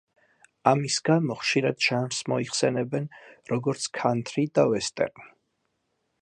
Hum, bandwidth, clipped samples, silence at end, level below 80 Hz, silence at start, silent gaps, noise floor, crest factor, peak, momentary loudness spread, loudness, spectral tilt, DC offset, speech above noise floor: none; 11 kHz; under 0.1%; 0.95 s; -68 dBFS; 0.65 s; none; -76 dBFS; 24 dB; -4 dBFS; 8 LU; -26 LUFS; -4.5 dB/octave; under 0.1%; 50 dB